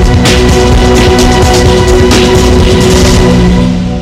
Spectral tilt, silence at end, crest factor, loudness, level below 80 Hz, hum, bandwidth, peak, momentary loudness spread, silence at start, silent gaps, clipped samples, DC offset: -5 dB/octave; 0 s; 4 dB; -6 LUFS; -10 dBFS; none; 16 kHz; 0 dBFS; 1 LU; 0 s; none; 2%; under 0.1%